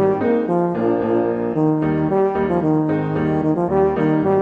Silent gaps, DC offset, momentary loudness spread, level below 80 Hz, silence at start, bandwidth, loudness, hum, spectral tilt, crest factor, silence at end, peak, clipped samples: none; under 0.1%; 2 LU; -44 dBFS; 0 s; 4.9 kHz; -18 LUFS; none; -10.5 dB/octave; 12 dB; 0 s; -6 dBFS; under 0.1%